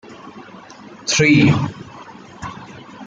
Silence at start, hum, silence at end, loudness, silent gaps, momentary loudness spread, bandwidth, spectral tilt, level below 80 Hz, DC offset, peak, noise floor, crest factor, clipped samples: 0.1 s; none; 0 s; -15 LUFS; none; 27 LU; 9 kHz; -4.5 dB/octave; -50 dBFS; under 0.1%; -2 dBFS; -39 dBFS; 18 dB; under 0.1%